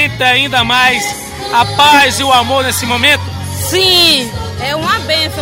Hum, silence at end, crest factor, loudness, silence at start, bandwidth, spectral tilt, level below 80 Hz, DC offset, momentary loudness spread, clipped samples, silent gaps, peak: none; 0 s; 12 dB; -10 LUFS; 0 s; 16.5 kHz; -2.5 dB/octave; -36 dBFS; under 0.1%; 12 LU; under 0.1%; none; 0 dBFS